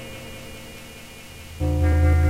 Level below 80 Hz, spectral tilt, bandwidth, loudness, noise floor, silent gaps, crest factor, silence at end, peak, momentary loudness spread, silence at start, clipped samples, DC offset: -28 dBFS; -7 dB/octave; 15 kHz; -22 LUFS; -41 dBFS; none; 14 dB; 0 s; -8 dBFS; 20 LU; 0 s; under 0.1%; under 0.1%